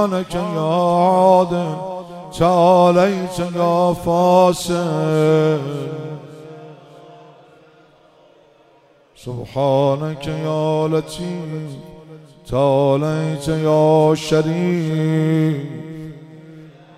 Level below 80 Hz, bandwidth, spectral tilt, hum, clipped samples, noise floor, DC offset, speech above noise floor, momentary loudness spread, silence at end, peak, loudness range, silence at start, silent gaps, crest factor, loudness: -48 dBFS; 14.5 kHz; -7 dB/octave; none; under 0.1%; -52 dBFS; under 0.1%; 36 dB; 18 LU; 0.25 s; -2 dBFS; 9 LU; 0 s; none; 16 dB; -17 LUFS